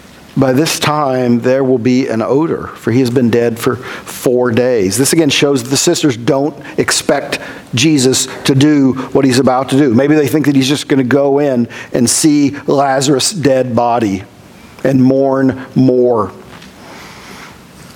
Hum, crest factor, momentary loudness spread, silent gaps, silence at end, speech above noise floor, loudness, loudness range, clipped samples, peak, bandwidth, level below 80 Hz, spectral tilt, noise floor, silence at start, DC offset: none; 12 dB; 8 LU; none; 0 s; 25 dB; -12 LUFS; 2 LU; under 0.1%; 0 dBFS; 17.5 kHz; -50 dBFS; -4.5 dB/octave; -37 dBFS; 0.35 s; under 0.1%